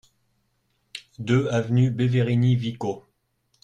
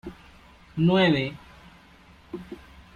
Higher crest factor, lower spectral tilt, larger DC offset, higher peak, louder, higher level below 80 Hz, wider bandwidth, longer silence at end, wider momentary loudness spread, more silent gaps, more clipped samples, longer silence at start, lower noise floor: about the same, 16 dB vs 18 dB; about the same, -7.5 dB/octave vs -7.5 dB/octave; neither; about the same, -8 dBFS vs -10 dBFS; about the same, -23 LUFS vs -23 LUFS; about the same, -54 dBFS vs -54 dBFS; first, 9 kHz vs 7.2 kHz; first, 0.65 s vs 0.4 s; second, 19 LU vs 24 LU; neither; neither; first, 0.95 s vs 0.05 s; first, -71 dBFS vs -53 dBFS